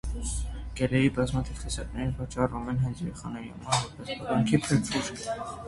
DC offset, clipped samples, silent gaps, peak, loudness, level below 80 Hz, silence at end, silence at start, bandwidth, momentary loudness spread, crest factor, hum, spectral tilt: under 0.1%; under 0.1%; none; -8 dBFS; -30 LUFS; -40 dBFS; 0 s; 0.05 s; 11.5 kHz; 11 LU; 22 dB; none; -5.5 dB/octave